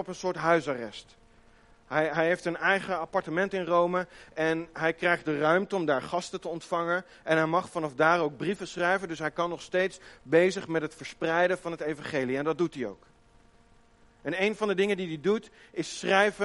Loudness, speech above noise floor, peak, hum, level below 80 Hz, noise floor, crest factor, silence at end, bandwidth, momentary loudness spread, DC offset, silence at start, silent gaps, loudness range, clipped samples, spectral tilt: -28 LUFS; 31 dB; -8 dBFS; none; -64 dBFS; -59 dBFS; 22 dB; 0 s; 11.5 kHz; 10 LU; under 0.1%; 0 s; none; 4 LU; under 0.1%; -5 dB/octave